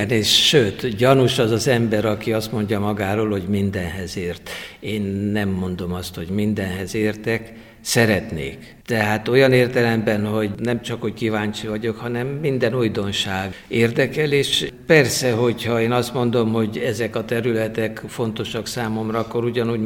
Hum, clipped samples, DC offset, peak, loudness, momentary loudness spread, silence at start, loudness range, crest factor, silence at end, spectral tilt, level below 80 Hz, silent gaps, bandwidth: none; under 0.1%; under 0.1%; 0 dBFS; -20 LUFS; 11 LU; 0 s; 5 LU; 20 dB; 0 s; -5 dB/octave; -48 dBFS; none; 18 kHz